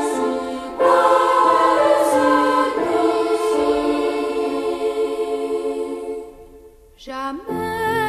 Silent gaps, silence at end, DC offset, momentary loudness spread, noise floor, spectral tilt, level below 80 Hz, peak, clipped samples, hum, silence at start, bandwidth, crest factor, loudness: none; 0 s; under 0.1%; 13 LU; -45 dBFS; -4 dB/octave; -50 dBFS; -4 dBFS; under 0.1%; none; 0 s; 14 kHz; 16 dB; -19 LUFS